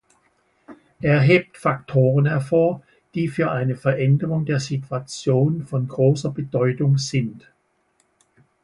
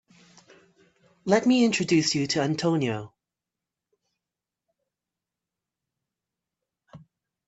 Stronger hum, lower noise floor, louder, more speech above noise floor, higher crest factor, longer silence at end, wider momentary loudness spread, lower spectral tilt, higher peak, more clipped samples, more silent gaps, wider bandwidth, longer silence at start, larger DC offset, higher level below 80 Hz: neither; second, -66 dBFS vs -89 dBFS; first, -21 LUFS vs -24 LUFS; second, 46 dB vs 65 dB; about the same, 18 dB vs 22 dB; first, 1.25 s vs 0.5 s; about the same, 9 LU vs 9 LU; first, -7 dB/octave vs -4.5 dB/octave; first, -4 dBFS vs -8 dBFS; neither; neither; first, 11.5 kHz vs 8.4 kHz; second, 0.7 s vs 1.25 s; neither; first, -56 dBFS vs -68 dBFS